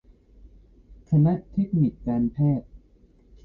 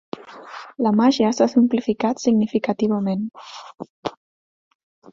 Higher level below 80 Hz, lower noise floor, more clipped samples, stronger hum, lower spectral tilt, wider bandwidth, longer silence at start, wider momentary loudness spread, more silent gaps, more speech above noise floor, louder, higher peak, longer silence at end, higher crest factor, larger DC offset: first, -48 dBFS vs -62 dBFS; first, -56 dBFS vs -39 dBFS; neither; neither; first, -12.5 dB/octave vs -6 dB/octave; second, 4 kHz vs 7.6 kHz; first, 0.9 s vs 0.2 s; second, 5 LU vs 20 LU; second, none vs 3.90-4.03 s; first, 34 dB vs 19 dB; second, -24 LUFS vs -20 LUFS; second, -10 dBFS vs -4 dBFS; second, 0.7 s vs 1.05 s; about the same, 16 dB vs 18 dB; neither